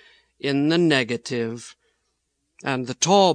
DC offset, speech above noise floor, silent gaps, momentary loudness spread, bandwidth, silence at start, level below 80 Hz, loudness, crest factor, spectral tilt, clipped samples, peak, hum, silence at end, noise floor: under 0.1%; 53 dB; none; 14 LU; 10.5 kHz; 0.45 s; -70 dBFS; -22 LUFS; 20 dB; -4 dB/octave; under 0.1%; -4 dBFS; none; 0 s; -74 dBFS